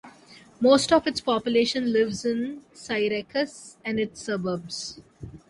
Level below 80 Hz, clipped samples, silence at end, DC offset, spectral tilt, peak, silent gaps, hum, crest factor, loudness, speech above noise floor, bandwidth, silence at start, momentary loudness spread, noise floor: -58 dBFS; under 0.1%; 0.1 s; under 0.1%; -4 dB/octave; -6 dBFS; none; none; 20 dB; -25 LUFS; 27 dB; 11.5 kHz; 0.05 s; 15 LU; -51 dBFS